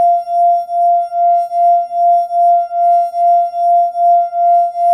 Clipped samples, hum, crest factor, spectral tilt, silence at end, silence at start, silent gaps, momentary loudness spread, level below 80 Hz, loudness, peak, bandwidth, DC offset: under 0.1%; none; 8 dB; -3 dB/octave; 0 s; 0 s; none; 1 LU; -70 dBFS; -12 LUFS; -4 dBFS; 5.8 kHz; under 0.1%